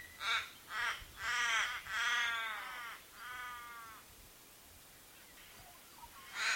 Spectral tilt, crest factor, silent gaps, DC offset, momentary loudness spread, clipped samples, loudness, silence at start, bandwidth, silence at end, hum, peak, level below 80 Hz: 1 dB/octave; 22 dB; none; under 0.1%; 23 LU; under 0.1%; -38 LUFS; 0 s; 17 kHz; 0 s; none; -20 dBFS; -68 dBFS